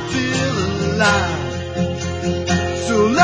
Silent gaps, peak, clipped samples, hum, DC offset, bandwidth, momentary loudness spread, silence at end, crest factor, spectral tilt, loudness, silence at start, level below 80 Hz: none; 0 dBFS; under 0.1%; none; under 0.1%; 8 kHz; 7 LU; 0 s; 18 dB; -5 dB/octave; -19 LUFS; 0 s; -34 dBFS